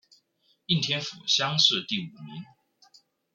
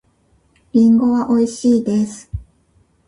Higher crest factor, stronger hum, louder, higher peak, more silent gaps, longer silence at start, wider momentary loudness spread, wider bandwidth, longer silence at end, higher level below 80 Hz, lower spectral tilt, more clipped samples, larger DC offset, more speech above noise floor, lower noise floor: first, 24 dB vs 14 dB; neither; second, -24 LUFS vs -16 LUFS; about the same, -6 dBFS vs -4 dBFS; neither; about the same, 0.7 s vs 0.75 s; first, 22 LU vs 19 LU; second, 7.6 kHz vs 10.5 kHz; first, 0.9 s vs 0.65 s; second, -72 dBFS vs -42 dBFS; second, -3 dB/octave vs -7 dB/octave; neither; neither; about the same, 42 dB vs 44 dB; first, -69 dBFS vs -58 dBFS